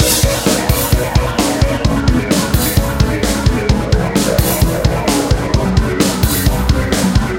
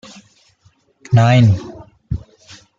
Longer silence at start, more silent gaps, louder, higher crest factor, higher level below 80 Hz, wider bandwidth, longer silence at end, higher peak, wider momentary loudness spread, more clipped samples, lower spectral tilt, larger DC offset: second, 0 s vs 1.1 s; neither; about the same, -14 LUFS vs -15 LUFS; about the same, 14 dB vs 16 dB; first, -20 dBFS vs -40 dBFS; first, 17 kHz vs 7.4 kHz; second, 0 s vs 0.6 s; about the same, 0 dBFS vs -2 dBFS; second, 2 LU vs 17 LU; neither; second, -5 dB/octave vs -7.5 dB/octave; first, 0.2% vs under 0.1%